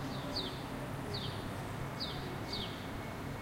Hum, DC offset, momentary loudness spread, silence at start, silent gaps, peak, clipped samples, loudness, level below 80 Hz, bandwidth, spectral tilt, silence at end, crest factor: none; under 0.1%; 4 LU; 0 s; none; -26 dBFS; under 0.1%; -40 LUFS; -54 dBFS; 16 kHz; -5 dB/octave; 0 s; 14 dB